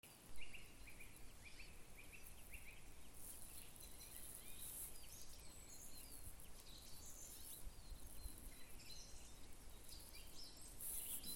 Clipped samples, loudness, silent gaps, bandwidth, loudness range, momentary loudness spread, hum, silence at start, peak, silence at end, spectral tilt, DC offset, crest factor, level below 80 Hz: under 0.1%; -56 LUFS; none; 17 kHz; 4 LU; 9 LU; none; 0.05 s; -34 dBFS; 0 s; -2 dB/octave; under 0.1%; 20 dB; -62 dBFS